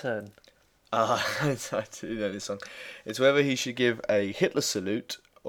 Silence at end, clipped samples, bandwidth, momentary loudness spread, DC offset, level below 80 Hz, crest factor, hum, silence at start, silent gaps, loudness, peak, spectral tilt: 0 s; under 0.1%; 19 kHz; 13 LU; under 0.1%; -64 dBFS; 20 dB; none; 0 s; none; -28 LUFS; -8 dBFS; -4 dB/octave